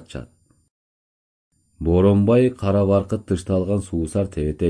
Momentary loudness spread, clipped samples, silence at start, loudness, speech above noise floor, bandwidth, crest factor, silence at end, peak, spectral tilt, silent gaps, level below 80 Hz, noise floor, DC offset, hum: 9 LU; under 0.1%; 0 s; -20 LUFS; over 71 dB; 10.5 kHz; 16 dB; 0 s; -4 dBFS; -8 dB/octave; 0.71-1.51 s; -40 dBFS; under -90 dBFS; under 0.1%; none